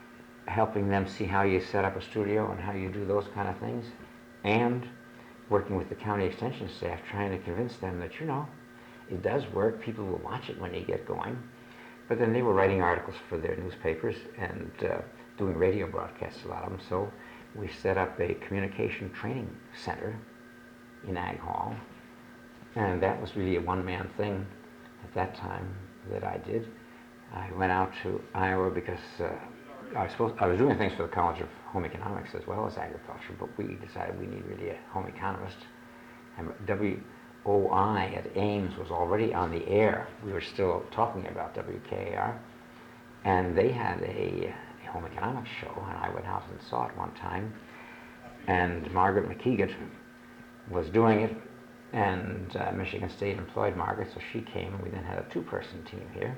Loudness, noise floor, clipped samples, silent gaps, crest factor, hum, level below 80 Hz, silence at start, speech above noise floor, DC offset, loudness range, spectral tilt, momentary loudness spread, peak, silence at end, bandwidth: -32 LUFS; -51 dBFS; under 0.1%; none; 22 dB; none; -56 dBFS; 0 s; 20 dB; under 0.1%; 7 LU; -7.5 dB/octave; 19 LU; -10 dBFS; 0 s; 19 kHz